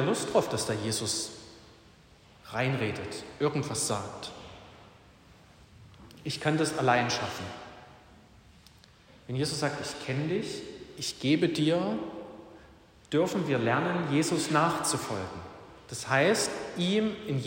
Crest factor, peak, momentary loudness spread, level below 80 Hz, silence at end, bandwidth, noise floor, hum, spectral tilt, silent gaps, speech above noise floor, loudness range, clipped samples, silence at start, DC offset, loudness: 20 dB; -10 dBFS; 18 LU; -62 dBFS; 0 s; 16 kHz; -57 dBFS; none; -4.5 dB/octave; none; 28 dB; 7 LU; under 0.1%; 0 s; under 0.1%; -29 LUFS